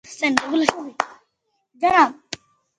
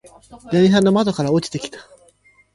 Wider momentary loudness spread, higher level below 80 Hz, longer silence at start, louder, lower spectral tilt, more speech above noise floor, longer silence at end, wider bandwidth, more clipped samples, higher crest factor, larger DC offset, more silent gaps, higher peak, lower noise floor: first, 19 LU vs 15 LU; second, -60 dBFS vs -54 dBFS; second, 0.1 s vs 0.3 s; second, -20 LUFS vs -17 LUFS; second, -3 dB/octave vs -6.5 dB/octave; first, 54 dB vs 37 dB; second, 0.45 s vs 0.75 s; about the same, 11 kHz vs 11.5 kHz; neither; first, 22 dB vs 16 dB; neither; neither; about the same, 0 dBFS vs -2 dBFS; first, -73 dBFS vs -55 dBFS